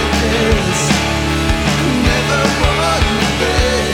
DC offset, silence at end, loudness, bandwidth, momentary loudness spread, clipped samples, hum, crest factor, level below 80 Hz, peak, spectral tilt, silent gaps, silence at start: under 0.1%; 0 s; -14 LUFS; 18.5 kHz; 1 LU; under 0.1%; none; 14 dB; -22 dBFS; 0 dBFS; -4.5 dB/octave; none; 0 s